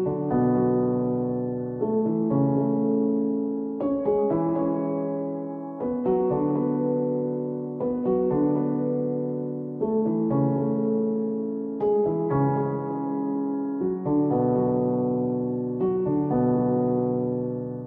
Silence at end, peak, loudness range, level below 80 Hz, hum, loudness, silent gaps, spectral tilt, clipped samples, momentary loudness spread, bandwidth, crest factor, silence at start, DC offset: 0 s; -10 dBFS; 2 LU; -58 dBFS; none; -25 LUFS; none; -13.5 dB/octave; under 0.1%; 6 LU; 2.9 kHz; 14 dB; 0 s; under 0.1%